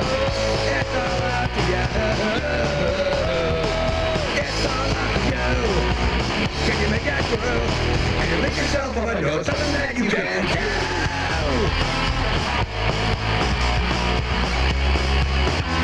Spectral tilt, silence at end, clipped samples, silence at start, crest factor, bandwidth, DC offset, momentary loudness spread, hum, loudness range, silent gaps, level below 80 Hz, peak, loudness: -5 dB/octave; 0 s; under 0.1%; 0 s; 16 dB; 11 kHz; under 0.1%; 2 LU; none; 0 LU; none; -28 dBFS; -6 dBFS; -21 LUFS